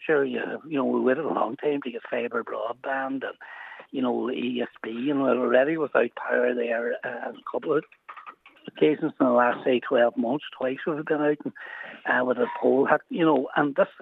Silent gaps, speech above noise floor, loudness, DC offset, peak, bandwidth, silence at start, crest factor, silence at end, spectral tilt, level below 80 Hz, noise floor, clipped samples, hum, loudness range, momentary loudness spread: none; 22 dB; -25 LUFS; under 0.1%; -4 dBFS; 4.1 kHz; 0 s; 20 dB; 0 s; -8 dB/octave; -84 dBFS; -47 dBFS; under 0.1%; none; 5 LU; 13 LU